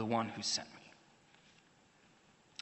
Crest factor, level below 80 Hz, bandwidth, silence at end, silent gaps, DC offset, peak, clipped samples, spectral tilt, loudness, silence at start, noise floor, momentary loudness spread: 22 dB; -84 dBFS; 8.2 kHz; 1.75 s; none; under 0.1%; -22 dBFS; under 0.1%; -3 dB/octave; -37 LUFS; 0 s; -67 dBFS; 22 LU